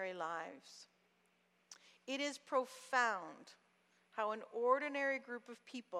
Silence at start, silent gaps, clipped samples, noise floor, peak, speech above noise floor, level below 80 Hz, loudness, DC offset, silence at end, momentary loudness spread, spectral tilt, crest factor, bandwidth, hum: 0 s; none; under 0.1%; -77 dBFS; -22 dBFS; 36 dB; under -90 dBFS; -40 LUFS; under 0.1%; 0 s; 23 LU; -2.5 dB/octave; 20 dB; 14 kHz; none